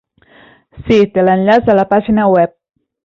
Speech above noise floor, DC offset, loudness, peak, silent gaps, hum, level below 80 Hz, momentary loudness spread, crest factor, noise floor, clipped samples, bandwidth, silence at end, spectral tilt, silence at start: 35 dB; under 0.1%; -12 LUFS; -2 dBFS; none; none; -42 dBFS; 4 LU; 12 dB; -45 dBFS; under 0.1%; 7.2 kHz; 0.55 s; -8 dB/octave; 0.75 s